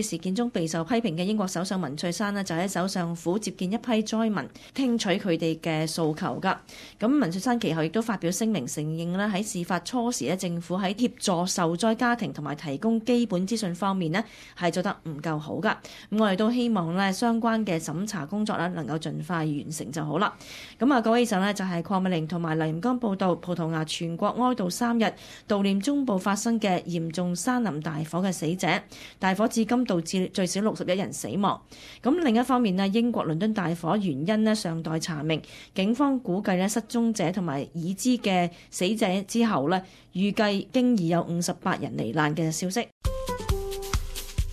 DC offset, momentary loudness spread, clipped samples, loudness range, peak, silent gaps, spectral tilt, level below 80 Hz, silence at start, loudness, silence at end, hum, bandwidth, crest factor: under 0.1%; 7 LU; under 0.1%; 2 LU; -8 dBFS; 42.92-43.01 s; -5 dB/octave; -46 dBFS; 0 s; -27 LUFS; 0 s; none; 14.5 kHz; 18 dB